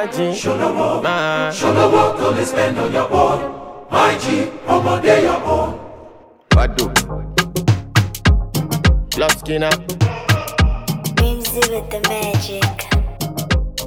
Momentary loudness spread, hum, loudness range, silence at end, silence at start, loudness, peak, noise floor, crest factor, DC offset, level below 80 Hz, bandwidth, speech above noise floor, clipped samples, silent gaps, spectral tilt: 6 LU; none; 2 LU; 0 s; 0 s; -17 LUFS; 0 dBFS; -42 dBFS; 16 dB; under 0.1%; -26 dBFS; over 20 kHz; 25 dB; under 0.1%; none; -5 dB/octave